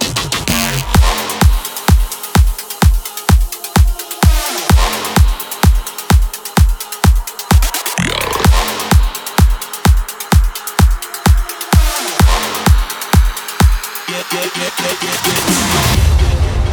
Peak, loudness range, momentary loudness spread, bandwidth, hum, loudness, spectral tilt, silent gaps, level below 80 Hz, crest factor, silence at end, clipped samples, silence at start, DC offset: 0 dBFS; 1 LU; 5 LU; over 20 kHz; none; -14 LUFS; -4 dB/octave; none; -14 dBFS; 12 dB; 0 s; under 0.1%; 0 s; under 0.1%